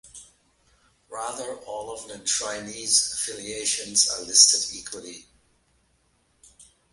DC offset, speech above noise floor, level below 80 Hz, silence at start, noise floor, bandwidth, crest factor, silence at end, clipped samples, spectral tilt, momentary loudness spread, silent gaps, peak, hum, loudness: under 0.1%; 41 dB; -64 dBFS; 0.05 s; -67 dBFS; 12 kHz; 26 dB; 0.3 s; under 0.1%; 1 dB/octave; 21 LU; none; -2 dBFS; none; -21 LUFS